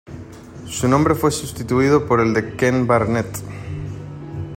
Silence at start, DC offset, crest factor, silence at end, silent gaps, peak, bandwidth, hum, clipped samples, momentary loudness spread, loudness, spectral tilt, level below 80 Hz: 0.05 s; under 0.1%; 16 dB; 0 s; none; -2 dBFS; 16.5 kHz; none; under 0.1%; 17 LU; -18 LUFS; -6 dB/octave; -44 dBFS